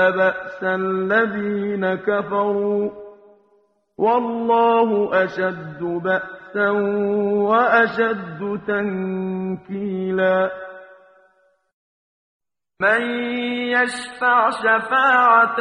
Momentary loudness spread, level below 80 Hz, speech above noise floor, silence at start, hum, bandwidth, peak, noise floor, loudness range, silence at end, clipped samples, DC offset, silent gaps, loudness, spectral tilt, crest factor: 11 LU; -62 dBFS; 42 dB; 0 s; none; 10.5 kHz; -2 dBFS; -61 dBFS; 5 LU; 0 s; under 0.1%; under 0.1%; 11.73-12.40 s; -19 LUFS; -6 dB/octave; 18 dB